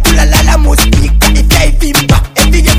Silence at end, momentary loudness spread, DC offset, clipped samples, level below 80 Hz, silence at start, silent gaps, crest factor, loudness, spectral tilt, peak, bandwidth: 0 s; 2 LU; under 0.1%; 0.6%; -8 dBFS; 0 s; none; 6 dB; -8 LUFS; -4 dB/octave; 0 dBFS; 16.5 kHz